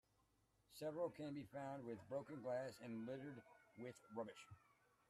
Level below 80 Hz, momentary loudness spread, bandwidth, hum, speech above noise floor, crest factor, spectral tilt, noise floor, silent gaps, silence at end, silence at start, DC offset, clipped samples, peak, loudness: -86 dBFS; 15 LU; 13 kHz; none; 31 dB; 18 dB; -6.5 dB/octave; -82 dBFS; none; 0.5 s; 0.7 s; under 0.1%; under 0.1%; -34 dBFS; -52 LUFS